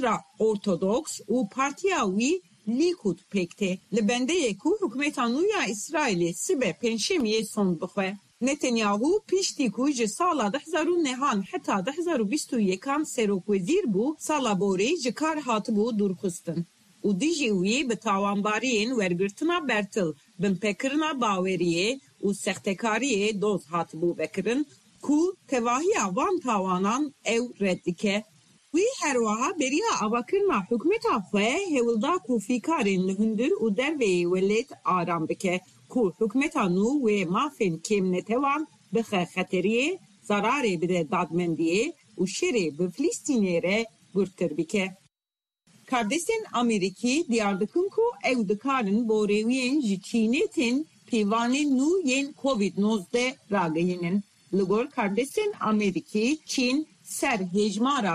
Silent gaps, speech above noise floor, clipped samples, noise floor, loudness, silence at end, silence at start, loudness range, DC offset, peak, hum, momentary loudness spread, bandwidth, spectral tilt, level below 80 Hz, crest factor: none; over 64 dB; under 0.1%; under -90 dBFS; -26 LUFS; 0 s; 0 s; 2 LU; under 0.1%; -12 dBFS; none; 5 LU; 13.5 kHz; -4.5 dB/octave; -66 dBFS; 14 dB